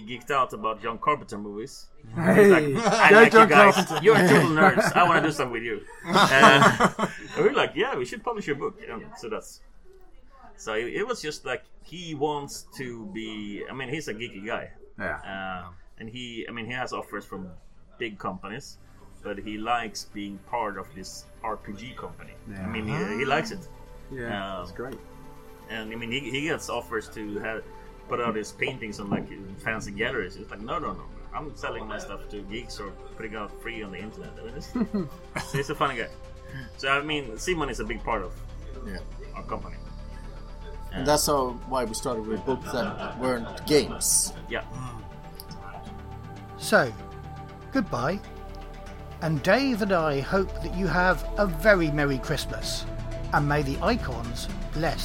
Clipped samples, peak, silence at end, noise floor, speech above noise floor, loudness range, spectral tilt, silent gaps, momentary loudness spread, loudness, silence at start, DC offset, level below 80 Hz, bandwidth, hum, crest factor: under 0.1%; -2 dBFS; 0 s; -48 dBFS; 22 dB; 16 LU; -4.5 dB/octave; none; 22 LU; -24 LUFS; 0 s; under 0.1%; -42 dBFS; 16.5 kHz; none; 24 dB